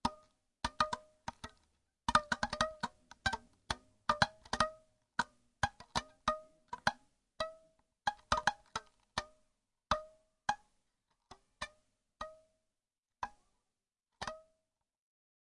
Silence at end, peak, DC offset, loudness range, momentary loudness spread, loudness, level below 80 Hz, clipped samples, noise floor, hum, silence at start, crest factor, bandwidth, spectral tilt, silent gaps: 1.1 s; -10 dBFS; under 0.1%; 14 LU; 16 LU; -39 LUFS; -60 dBFS; under 0.1%; under -90 dBFS; none; 0.05 s; 32 dB; 11.5 kHz; -3 dB/octave; none